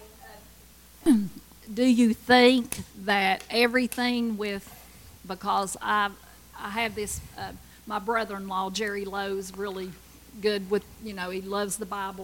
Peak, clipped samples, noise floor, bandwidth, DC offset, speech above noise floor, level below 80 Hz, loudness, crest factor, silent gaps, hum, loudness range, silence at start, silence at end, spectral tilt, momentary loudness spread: -4 dBFS; under 0.1%; -52 dBFS; 17 kHz; under 0.1%; 26 dB; -54 dBFS; -26 LUFS; 22 dB; none; none; 8 LU; 0 s; 0 s; -4 dB/octave; 17 LU